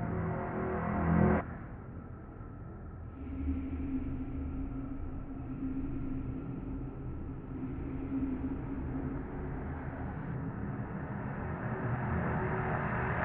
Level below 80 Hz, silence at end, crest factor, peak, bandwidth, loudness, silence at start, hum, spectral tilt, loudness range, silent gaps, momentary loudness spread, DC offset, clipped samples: -44 dBFS; 0 s; 20 dB; -16 dBFS; 3.7 kHz; -37 LUFS; 0 s; none; -9 dB/octave; 5 LU; none; 12 LU; under 0.1%; under 0.1%